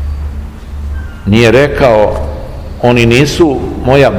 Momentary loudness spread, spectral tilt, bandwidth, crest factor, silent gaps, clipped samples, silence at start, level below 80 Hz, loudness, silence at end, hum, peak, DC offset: 17 LU; -6 dB/octave; 16.5 kHz; 10 dB; none; 4%; 0 s; -22 dBFS; -9 LUFS; 0 s; none; 0 dBFS; 0.6%